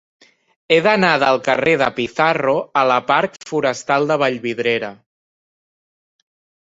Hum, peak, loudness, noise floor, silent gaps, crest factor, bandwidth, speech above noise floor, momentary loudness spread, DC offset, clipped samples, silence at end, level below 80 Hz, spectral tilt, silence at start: none; 0 dBFS; -17 LUFS; under -90 dBFS; none; 18 dB; 8 kHz; over 73 dB; 6 LU; under 0.1%; under 0.1%; 1.75 s; -60 dBFS; -4.5 dB/octave; 0.7 s